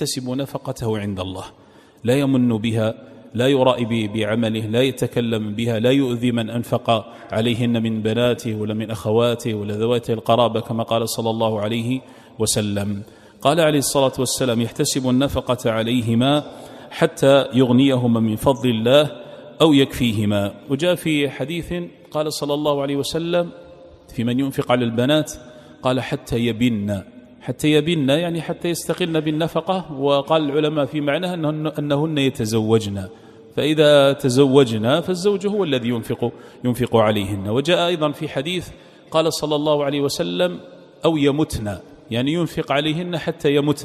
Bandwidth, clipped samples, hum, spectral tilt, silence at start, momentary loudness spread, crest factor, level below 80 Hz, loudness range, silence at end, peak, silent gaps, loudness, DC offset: 15 kHz; under 0.1%; none; -5.5 dB/octave; 0 s; 10 LU; 18 dB; -50 dBFS; 4 LU; 0 s; 0 dBFS; none; -20 LUFS; under 0.1%